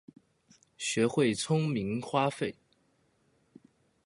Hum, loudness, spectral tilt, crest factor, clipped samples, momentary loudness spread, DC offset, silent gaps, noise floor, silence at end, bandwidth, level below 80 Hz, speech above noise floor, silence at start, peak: none; -30 LUFS; -5 dB/octave; 20 dB; under 0.1%; 10 LU; under 0.1%; none; -71 dBFS; 1.55 s; 11.5 kHz; -68 dBFS; 42 dB; 0.8 s; -14 dBFS